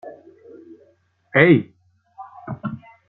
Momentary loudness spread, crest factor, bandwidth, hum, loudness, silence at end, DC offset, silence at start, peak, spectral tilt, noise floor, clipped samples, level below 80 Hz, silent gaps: 27 LU; 22 dB; 4.2 kHz; none; -18 LUFS; 0.3 s; under 0.1%; 0.05 s; 0 dBFS; -10 dB/octave; -59 dBFS; under 0.1%; -60 dBFS; none